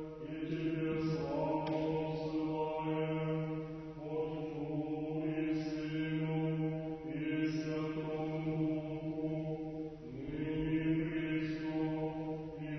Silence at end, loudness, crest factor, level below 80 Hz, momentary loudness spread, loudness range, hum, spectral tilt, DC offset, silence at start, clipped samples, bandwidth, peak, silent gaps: 0 s; -38 LUFS; 14 dB; -60 dBFS; 6 LU; 2 LU; none; -7 dB/octave; under 0.1%; 0 s; under 0.1%; 6.2 kHz; -24 dBFS; none